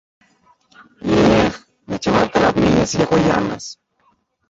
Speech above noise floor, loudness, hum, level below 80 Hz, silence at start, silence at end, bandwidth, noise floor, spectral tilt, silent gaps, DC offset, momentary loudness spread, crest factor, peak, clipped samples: 45 dB; -16 LUFS; none; -40 dBFS; 1.05 s; 0.75 s; 8 kHz; -62 dBFS; -5.5 dB/octave; none; under 0.1%; 15 LU; 16 dB; -2 dBFS; under 0.1%